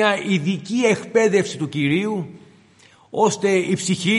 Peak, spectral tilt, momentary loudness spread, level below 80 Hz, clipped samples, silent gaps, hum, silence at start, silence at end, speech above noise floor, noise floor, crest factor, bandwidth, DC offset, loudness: -2 dBFS; -5 dB/octave; 8 LU; -66 dBFS; under 0.1%; none; none; 0 s; 0 s; 33 dB; -52 dBFS; 18 dB; 11.5 kHz; under 0.1%; -20 LUFS